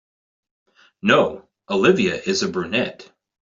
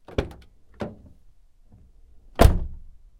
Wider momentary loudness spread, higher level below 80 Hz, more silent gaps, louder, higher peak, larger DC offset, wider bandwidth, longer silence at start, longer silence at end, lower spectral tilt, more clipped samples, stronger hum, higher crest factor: second, 9 LU vs 19 LU; second, -60 dBFS vs -28 dBFS; neither; first, -20 LUFS vs -25 LUFS; about the same, -2 dBFS vs 0 dBFS; neither; second, 7.8 kHz vs 16.5 kHz; first, 1.05 s vs 0.2 s; about the same, 0.45 s vs 0.4 s; second, -4.5 dB/octave vs -6.5 dB/octave; neither; neither; second, 20 dB vs 26 dB